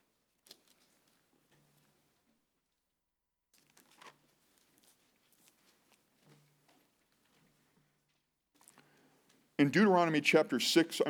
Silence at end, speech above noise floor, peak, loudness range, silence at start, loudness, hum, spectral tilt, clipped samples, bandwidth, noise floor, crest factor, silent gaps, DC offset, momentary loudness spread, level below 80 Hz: 0 s; 58 dB; -14 dBFS; 9 LU; 4.05 s; -29 LUFS; none; -4.5 dB/octave; under 0.1%; over 20 kHz; -87 dBFS; 24 dB; none; under 0.1%; 5 LU; under -90 dBFS